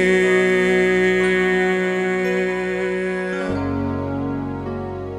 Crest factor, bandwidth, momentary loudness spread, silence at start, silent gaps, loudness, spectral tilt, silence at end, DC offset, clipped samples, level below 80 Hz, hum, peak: 14 dB; 10.5 kHz; 10 LU; 0 s; none; -19 LUFS; -6 dB/octave; 0 s; under 0.1%; under 0.1%; -46 dBFS; none; -6 dBFS